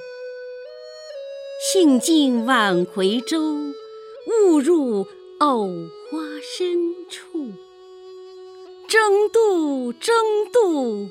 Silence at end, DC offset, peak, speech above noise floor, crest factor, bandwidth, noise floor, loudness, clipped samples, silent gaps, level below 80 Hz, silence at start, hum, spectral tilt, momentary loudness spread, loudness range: 0 s; under 0.1%; -2 dBFS; 23 dB; 18 dB; 16 kHz; -42 dBFS; -19 LUFS; under 0.1%; none; -76 dBFS; 0 s; none; -4 dB/octave; 21 LU; 7 LU